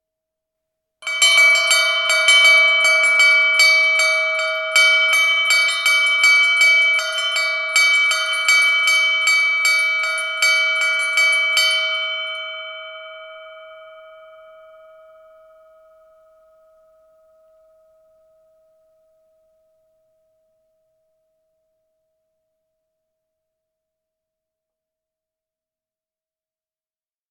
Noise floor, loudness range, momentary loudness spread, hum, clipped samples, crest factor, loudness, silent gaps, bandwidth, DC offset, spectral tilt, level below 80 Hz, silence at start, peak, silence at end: under -90 dBFS; 8 LU; 11 LU; none; under 0.1%; 18 dB; -13 LUFS; none; 14.5 kHz; under 0.1%; 5 dB/octave; -78 dBFS; 1 s; 0 dBFS; 13.45 s